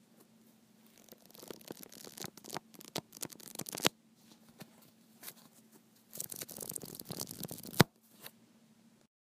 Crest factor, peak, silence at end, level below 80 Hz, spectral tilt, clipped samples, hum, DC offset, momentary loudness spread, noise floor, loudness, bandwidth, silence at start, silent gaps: 40 dB; -2 dBFS; 0.75 s; -70 dBFS; -3.5 dB/octave; under 0.1%; none; under 0.1%; 25 LU; -65 dBFS; -39 LUFS; 16 kHz; 0.2 s; none